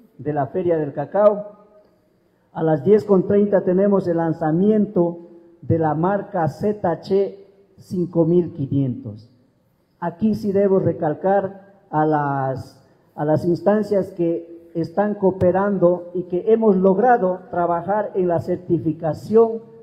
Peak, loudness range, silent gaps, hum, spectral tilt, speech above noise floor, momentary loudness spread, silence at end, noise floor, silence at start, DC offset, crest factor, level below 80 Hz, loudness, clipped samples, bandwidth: -2 dBFS; 4 LU; none; none; -10 dB/octave; 43 dB; 10 LU; 0.2 s; -62 dBFS; 0.2 s; under 0.1%; 16 dB; -56 dBFS; -20 LUFS; under 0.1%; 8.6 kHz